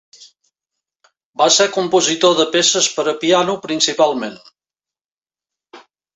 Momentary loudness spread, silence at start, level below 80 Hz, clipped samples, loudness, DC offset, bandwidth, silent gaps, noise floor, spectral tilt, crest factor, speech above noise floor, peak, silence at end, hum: 7 LU; 1.4 s; -64 dBFS; under 0.1%; -15 LUFS; under 0.1%; 8.4 kHz; 5.01-5.05 s; under -90 dBFS; -2 dB/octave; 18 dB; over 75 dB; 0 dBFS; 0.35 s; none